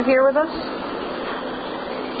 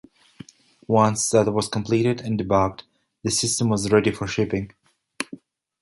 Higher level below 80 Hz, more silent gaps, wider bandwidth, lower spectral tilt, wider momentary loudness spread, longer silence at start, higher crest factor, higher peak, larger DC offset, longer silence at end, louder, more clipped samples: about the same, -52 dBFS vs -50 dBFS; neither; second, 5 kHz vs 11.5 kHz; first, -9 dB/octave vs -4.5 dB/octave; about the same, 12 LU vs 13 LU; second, 0 s vs 0.9 s; about the same, 16 dB vs 20 dB; about the same, -6 dBFS vs -4 dBFS; neither; second, 0 s vs 0.45 s; about the same, -23 LUFS vs -22 LUFS; neither